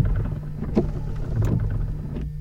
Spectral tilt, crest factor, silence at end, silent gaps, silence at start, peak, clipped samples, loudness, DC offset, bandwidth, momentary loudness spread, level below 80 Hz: -9.5 dB/octave; 20 dB; 0 s; none; 0 s; -4 dBFS; under 0.1%; -27 LUFS; under 0.1%; 7.8 kHz; 7 LU; -28 dBFS